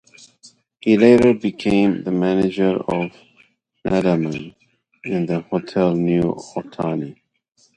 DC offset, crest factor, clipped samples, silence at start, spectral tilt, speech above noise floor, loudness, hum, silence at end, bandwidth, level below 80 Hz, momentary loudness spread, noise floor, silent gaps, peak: under 0.1%; 20 dB; under 0.1%; 0.45 s; -7.5 dB/octave; 39 dB; -19 LUFS; none; 0.65 s; 10.5 kHz; -50 dBFS; 16 LU; -57 dBFS; none; 0 dBFS